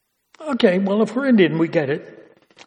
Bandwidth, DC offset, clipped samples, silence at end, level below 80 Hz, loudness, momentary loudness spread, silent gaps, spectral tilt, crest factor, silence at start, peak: 9.6 kHz; under 0.1%; under 0.1%; 0.45 s; -68 dBFS; -19 LUFS; 12 LU; none; -7 dB/octave; 18 dB; 0.4 s; 0 dBFS